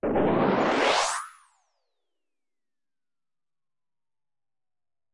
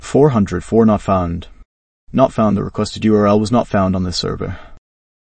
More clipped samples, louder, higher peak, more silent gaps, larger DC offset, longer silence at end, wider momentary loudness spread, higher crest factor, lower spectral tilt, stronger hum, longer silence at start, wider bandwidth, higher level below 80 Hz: neither; second, -24 LUFS vs -16 LUFS; second, -10 dBFS vs 0 dBFS; second, none vs 1.65-2.07 s; neither; first, 3.85 s vs 0.45 s; about the same, 10 LU vs 11 LU; about the same, 20 dB vs 16 dB; second, -4 dB/octave vs -7 dB/octave; neither; about the same, 0.05 s vs 0 s; first, 11.5 kHz vs 8.8 kHz; second, -58 dBFS vs -38 dBFS